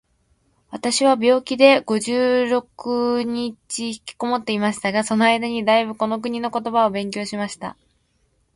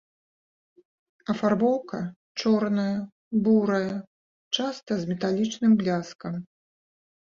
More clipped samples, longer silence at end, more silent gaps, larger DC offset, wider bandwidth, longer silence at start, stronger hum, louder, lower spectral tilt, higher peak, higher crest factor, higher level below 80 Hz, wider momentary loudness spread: neither; about the same, 0.85 s vs 0.8 s; second, none vs 2.16-2.35 s, 3.12-3.31 s, 4.07-4.51 s, 6.15-6.19 s; neither; first, 11.5 kHz vs 7.4 kHz; second, 0.7 s vs 1.3 s; neither; first, -20 LUFS vs -26 LUFS; second, -4 dB/octave vs -6 dB/octave; first, 0 dBFS vs -10 dBFS; about the same, 20 dB vs 16 dB; about the same, -62 dBFS vs -66 dBFS; about the same, 12 LU vs 13 LU